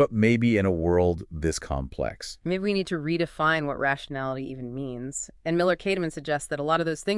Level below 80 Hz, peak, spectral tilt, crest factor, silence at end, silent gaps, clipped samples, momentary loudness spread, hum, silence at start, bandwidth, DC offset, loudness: -46 dBFS; -8 dBFS; -5.5 dB/octave; 16 dB; 0 s; none; under 0.1%; 11 LU; none; 0 s; 12 kHz; under 0.1%; -26 LUFS